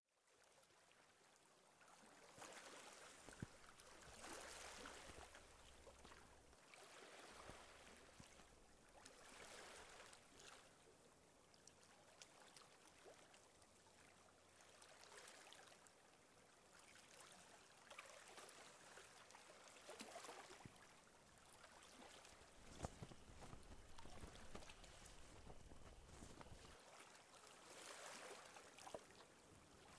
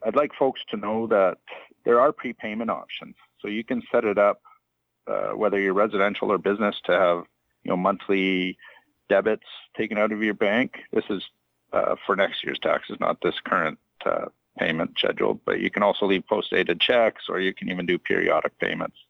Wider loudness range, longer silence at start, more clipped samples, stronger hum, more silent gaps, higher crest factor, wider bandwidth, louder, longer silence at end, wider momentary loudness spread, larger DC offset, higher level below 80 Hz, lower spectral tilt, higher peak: first, 6 LU vs 3 LU; about the same, 0 s vs 0 s; neither; neither; neither; first, 30 dB vs 18 dB; first, 11 kHz vs 6.6 kHz; second, -62 LUFS vs -24 LUFS; second, 0 s vs 0.25 s; about the same, 11 LU vs 10 LU; neither; second, -74 dBFS vs -64 dBFS; second, -3 dB/octave vs -7 dB/octave; second, -34 dBFS vs -6 dBFS